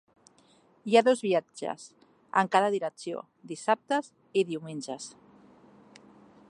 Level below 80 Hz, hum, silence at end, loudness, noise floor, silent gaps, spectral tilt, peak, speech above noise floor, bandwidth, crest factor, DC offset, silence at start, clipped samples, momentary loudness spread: -82 dBFS; none; 1.4 s; -28 LUFS; -62 dBFS; none; -4.5 dB/octave; -8 dBFS; 34 dB; 11 kHz; 22 dB; under 0.1%; 0.85 s; under 0.1%; 17 LU